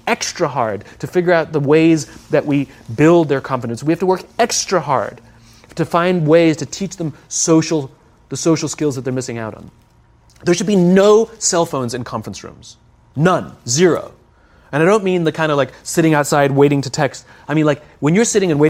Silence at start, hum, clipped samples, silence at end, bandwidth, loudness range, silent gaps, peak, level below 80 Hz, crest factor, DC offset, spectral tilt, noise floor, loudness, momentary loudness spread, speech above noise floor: 0.05 s; none; under 0.1%; 0 s; 16 kHz; 4 LU; none; 0 dBFS; -52 dBFS; 16 dB; under 0.1%; -5 dB/octave; -50 dBFS; -16 LUFS; 13 LU; 35 dB